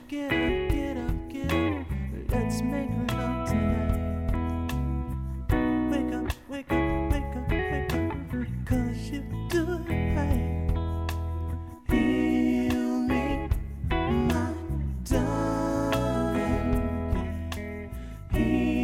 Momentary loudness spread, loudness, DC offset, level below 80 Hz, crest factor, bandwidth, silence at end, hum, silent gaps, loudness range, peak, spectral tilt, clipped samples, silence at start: 8 LU; -28 LUFS; 0.1%; -34 dBFS; 16 dB; 16 kHz; 0 s; none; none; 2 LU; -10 dBFS; -7 dB/octave; under 0.1%; 0 s